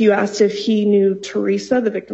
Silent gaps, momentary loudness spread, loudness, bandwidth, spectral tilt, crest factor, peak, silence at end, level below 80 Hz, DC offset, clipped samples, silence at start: none; 5 LU; -17 LUFS; 8 kHz; -5.5 dB/octave; 14 dB; -2 dBFS; 0 s; -62 dBFS; under 0.1%; under 0.1%; 0 s